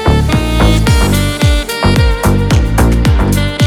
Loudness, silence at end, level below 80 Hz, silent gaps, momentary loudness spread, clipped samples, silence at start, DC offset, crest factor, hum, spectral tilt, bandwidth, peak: -11 LUFS; 0 s; -14 dBFS; none; 2 LU; under 0.1%; 0 s; under 0.1%; 10 dB; none; -5.5 dB/octave; 17 kHz; 0 dBFS